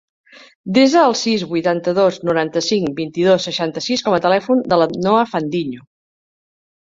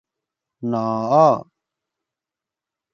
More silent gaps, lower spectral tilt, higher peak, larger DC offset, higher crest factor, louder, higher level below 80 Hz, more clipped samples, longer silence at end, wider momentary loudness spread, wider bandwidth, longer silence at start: neither; second, -5 dB/octave vs -8 dB/octave; about the same, -2 dBFS vs -2 dBFS; neither; about the same, 16 dB vs 20 dB; about the same, -16 LUFS vs -18 LUFS; first, -58 dBFS vs -68 dBFS; neither; second, 1.1 s vs 1.5 s; second, 8 LU vs 11 LU; about the same, 7.8 kHz vs 7.2 kHz; about the same, 0.65 s vs 0.6 s